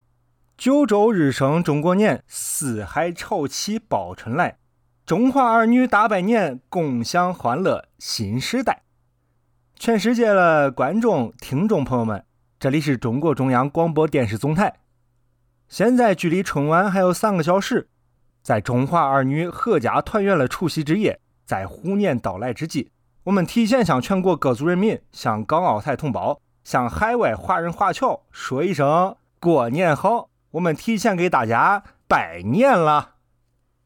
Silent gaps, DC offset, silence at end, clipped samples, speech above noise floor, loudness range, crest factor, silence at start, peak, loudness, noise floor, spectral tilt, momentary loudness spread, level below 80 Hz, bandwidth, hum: none; under 0.1%; 0.8 s; under 0.1%; 47 dB; 3 LU; 14 dB; 0.6 s; -6 dBFS; -20 LUFS; -66 dBFS; -6 dB/octave; 9 LU; -52 dBFS; 18.5 kHz; none